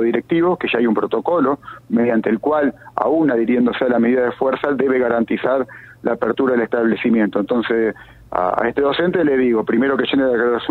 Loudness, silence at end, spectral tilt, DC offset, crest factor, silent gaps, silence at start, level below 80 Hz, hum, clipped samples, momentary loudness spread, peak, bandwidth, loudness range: -18 LUFS; 0 s; -8 dB/octave; under 0.1%; 16 dB; none; 0 s; -52 dBFS; none; under 0.1%; 5 LU; 0 dBFS; 4.4 kHz; 1 LU